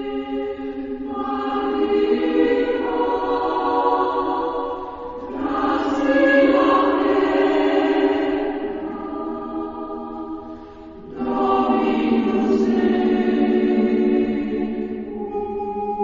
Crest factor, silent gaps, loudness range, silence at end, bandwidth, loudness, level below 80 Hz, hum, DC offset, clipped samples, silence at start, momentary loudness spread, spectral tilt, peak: 16 dB; none; 6 LU; 0 s; 7.4 kHz; -20 LUFS; -48 dBFS; none; under 0.1%; under 0.1%; 0 s; 12 LU; -7 dB/octave; -4 dBFS